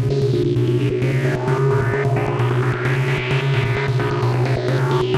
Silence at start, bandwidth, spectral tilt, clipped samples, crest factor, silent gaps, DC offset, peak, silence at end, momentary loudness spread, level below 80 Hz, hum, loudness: 0 s; 11 kHz; -7.5 dB/octave; under 0.1%; 12 dB; none; under 0.1%; -6 dBFS; 0 s; 1 LU; -42 dBFS; none; -19 LUFS